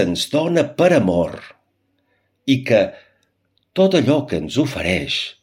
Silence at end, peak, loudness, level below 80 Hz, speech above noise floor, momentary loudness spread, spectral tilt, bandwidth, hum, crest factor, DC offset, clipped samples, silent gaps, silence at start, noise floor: 0.1 s; -2 dBFS; -18 LUFS; -52 dBFS; 49 dB; 10 LU; -5.5 dB/octave; 16.5 kHz; none; 18 dB; under 0.1%; under 0.1%; none; 0 s; -67 dBFS